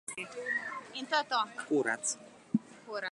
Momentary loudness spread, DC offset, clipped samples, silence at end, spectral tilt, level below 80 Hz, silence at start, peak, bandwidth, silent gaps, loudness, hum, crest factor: 10 LU; under 0.1%; under 0.1%; 0 s; -2.5 dB/octave; -84 dBFS; 0.1 s; -14 dBFS; 11.5 kHz; none; -34 LUFS; none; 22 dB